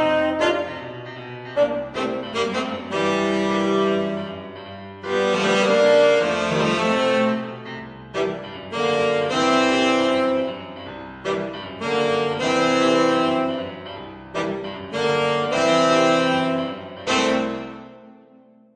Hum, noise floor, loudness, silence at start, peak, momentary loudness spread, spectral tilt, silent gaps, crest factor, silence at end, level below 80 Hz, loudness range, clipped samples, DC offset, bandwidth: none; -51 dBFS; -21 LUFS; 0 s; -6 dBFS; 17 LU; -4.5 dB/octave; none; 16 dB; 0.6 s; -56 dBFS; 4 LU; under 0.1%; under 0.1%; 10 kHz